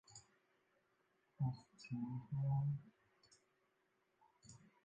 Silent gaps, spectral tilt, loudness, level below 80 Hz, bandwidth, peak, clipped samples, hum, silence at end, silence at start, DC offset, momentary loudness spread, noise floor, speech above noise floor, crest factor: none; -7.5 dB/octave; -44 LUFS; -76 dBFS; 8.6 kHz; -32 dBFS; under 0.1%; none; 0.25 s; 0.1 s; under 0.1%; 24 LU; -82 dBFS; 39 dB; 16 dB